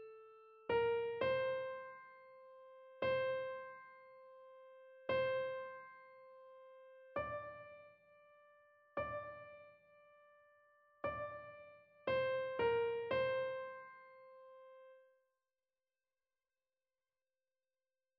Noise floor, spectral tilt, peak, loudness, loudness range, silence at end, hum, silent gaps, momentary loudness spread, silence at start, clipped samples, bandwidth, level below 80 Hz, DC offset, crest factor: under -90 dBFS; -2.5 dB/octave; -26 dBFS; -41 LUFS; 11 LU; 3.2 s; none; none; 23 LU; 0 s; under 0.1%; 5.6 kHz; -76 dBFS; under 0.1%; 18 dB